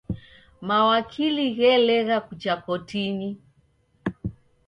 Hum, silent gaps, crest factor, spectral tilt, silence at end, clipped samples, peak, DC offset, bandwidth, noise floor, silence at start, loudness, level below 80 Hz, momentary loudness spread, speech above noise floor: none; none; 16 dB; -6.5 dB/octave; 0.35 s; under 0.1%; -8 dBFS; under 0.1%; 7.4 kHz; -63 dBFS; 0.1 s; -23 LUFS; -52 dBFS; 17 LU; 41 dB